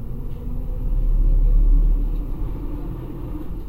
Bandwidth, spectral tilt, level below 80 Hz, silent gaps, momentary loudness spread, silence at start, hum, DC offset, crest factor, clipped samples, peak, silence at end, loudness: 1.5 kHz; -10 dB/octave; -20 dBFS; none; 12 LU; 0 s; none; 0.3%; 12 dB; under 0.1%; -8 dBFS; 0 s; -26 LUFS